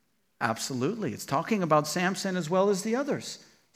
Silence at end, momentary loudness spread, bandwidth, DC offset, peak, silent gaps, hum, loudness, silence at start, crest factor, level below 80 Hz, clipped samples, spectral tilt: 0.35 s; 9 LU; 16 kHz; under 0.1%; -10 dBFS; none; none; -28 LUFS; 0.4 s; 20 dB; -76 dBFS; under 0.1%; -4.5 dB/octave